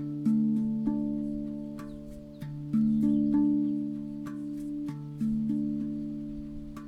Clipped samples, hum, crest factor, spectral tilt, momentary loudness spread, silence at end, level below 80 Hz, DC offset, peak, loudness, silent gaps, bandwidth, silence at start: under 0.1%; none; 14 dB; -9.5 dB/octave; 15 LU; 0 s; -52 dBFS; under 0.1%; -16 dBFS; -30 LUFS; none; 4.9 kHz; 0 s